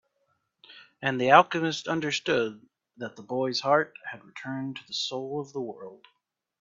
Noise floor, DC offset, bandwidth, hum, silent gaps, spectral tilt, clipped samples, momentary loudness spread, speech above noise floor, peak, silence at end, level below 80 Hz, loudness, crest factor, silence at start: -75 dBFS; under 0.1%; 7.8 kHz; none; none; -4.5 dB/octave; under 0.1%; 21 LU; 47 dB; -2 dBFS; 0.65 s; -72 dBFS; -27 LUFS; 26 dB; 0.7 s